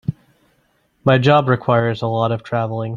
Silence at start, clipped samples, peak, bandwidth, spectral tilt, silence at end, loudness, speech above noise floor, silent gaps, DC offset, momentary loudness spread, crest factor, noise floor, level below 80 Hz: 0.1 s; under 0.1%; 0 dBFS; 7.2 kHz; -8 dB/octave; 0 s; -17 LUFS; 45 dB; none; under 0.1%; 9 LU; 18 dB; -62 dBFS; -52 dBFS